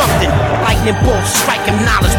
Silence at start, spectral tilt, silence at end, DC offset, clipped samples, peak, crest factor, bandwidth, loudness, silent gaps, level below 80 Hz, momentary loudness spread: 0 s; -4 dB/octave; 0 s; under 0.1%; under 0.1%; 0 dBFS; 12 dB; 18.5 kHz; -13 LUFS; none; -20 dBFS; 1 LU